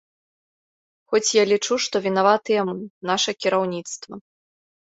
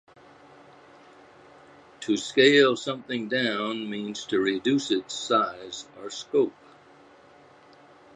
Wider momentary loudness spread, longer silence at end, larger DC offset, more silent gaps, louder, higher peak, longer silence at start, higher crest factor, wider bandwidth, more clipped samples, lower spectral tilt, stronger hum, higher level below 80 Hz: second, 15 LU vs 18 LU; second, 0.65 s vs 1.65 s; neither; first, 2.90-3.01 s vs none; first, -21 LUFS vs -25 LUFS; about the same, -4 dBFS vs -6 dBFS; second, 1.1 s vs 2 s; about the same, 20 dB vs 22 dB; second, 8 kHz vs 9.6 kHz; neither; about the same, -3 dB/octave vs -4 dB/octave; neither; about the same, -70 dBFS vs -72 dBFS